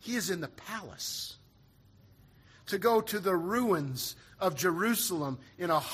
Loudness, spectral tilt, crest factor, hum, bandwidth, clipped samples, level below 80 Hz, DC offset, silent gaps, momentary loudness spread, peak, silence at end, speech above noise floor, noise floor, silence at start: -32 LUFS; -4 dB/octave; 18 dB; none; 15.5 kHz; under 0.1%; -66 dBFS; under 0.1%; none; 11 LU; -14 dBFS; 0 s; 30 dB; -61 dBFS; 0.05 s